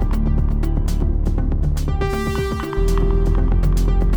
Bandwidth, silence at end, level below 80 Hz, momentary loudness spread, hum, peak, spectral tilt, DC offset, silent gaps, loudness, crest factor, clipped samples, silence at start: 11 kHz; 0 s; -18 dBFS; 3 LU; none; -6 dBFS; -7.5 dB/octave; under 0.1%; none; -21 LUFS; 10 dB; under 0.1%; 0 s